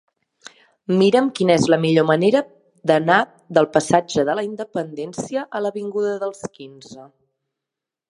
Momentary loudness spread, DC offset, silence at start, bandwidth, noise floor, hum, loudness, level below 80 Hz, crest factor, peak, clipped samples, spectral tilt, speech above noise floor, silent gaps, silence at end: 13 LU; under 0.1%; 0.45 s; 11.5 kHz; -86 dBFS; none; -19 LUFS; -62 dBFS; 20 dB; 0 dBFS; under 0.1%; -5.5 dB/octave; 67 dB; none; 1.05 s